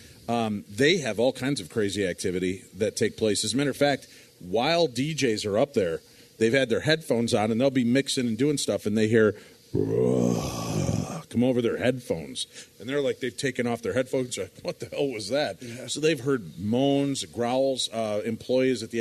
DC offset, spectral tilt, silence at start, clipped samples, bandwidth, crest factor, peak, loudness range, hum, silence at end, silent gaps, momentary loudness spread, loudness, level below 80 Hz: under 0.1%; -5 dB/octave; 0 s; under 0.1%; 13.5 kHz; 18 dB; -8 dBFS; 4 LU; none; 0 s; none; 8 LU; -26 LUFS; -58 dBFS